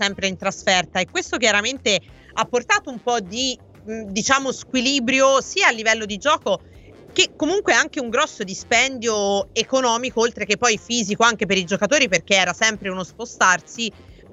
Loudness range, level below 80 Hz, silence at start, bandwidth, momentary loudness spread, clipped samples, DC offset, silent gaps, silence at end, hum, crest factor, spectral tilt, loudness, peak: 3 LU; -52 dBFS; 0 s; 8.4 kHz; 10 LU; under 0.1%; under 0.1%; none; 0.2 s; none; 20 dB; -2 dB/octave; -19 LUFS; 0 dBFS